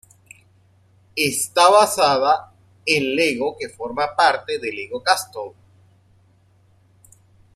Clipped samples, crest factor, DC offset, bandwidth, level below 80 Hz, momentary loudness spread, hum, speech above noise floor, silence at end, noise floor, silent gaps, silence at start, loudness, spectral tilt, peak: under 0.1%; 20 dB; under 0.1%; 15.5 kHz; -62 dBFS; 16 LU; none; 38 dB; 2.05 s; -56 dBFS; none; 1.15 s; -19 LUFS; -2.5 dB/octave; -2 dBFS